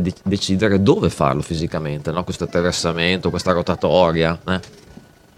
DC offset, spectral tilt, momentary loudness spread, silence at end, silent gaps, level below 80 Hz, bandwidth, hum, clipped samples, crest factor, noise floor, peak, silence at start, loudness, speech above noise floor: under 0.1%; -5.5 dB/octave; 9 LU; 0.7 s; none; -42 dBFS; 14 kHz; none; under 0.1%; 20 dB; -45 dBFS; 0 dBFS; 0 s; -19 LUFS; 26 dB